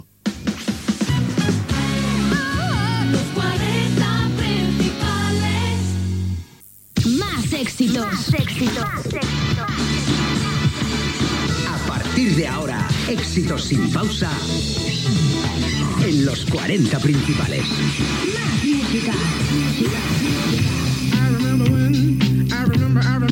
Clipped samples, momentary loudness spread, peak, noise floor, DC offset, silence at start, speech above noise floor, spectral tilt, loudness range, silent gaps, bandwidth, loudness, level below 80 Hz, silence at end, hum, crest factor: under 0.1%; 5 LU; -4 dBFS; -46 dBFS; under 0.1%; 0.25 s; 26 dB; -5.5 dB/octave; 3 LU; none; 17 kHz; -20 LUFS; -36 dBFS; 0 s; none; 14 dB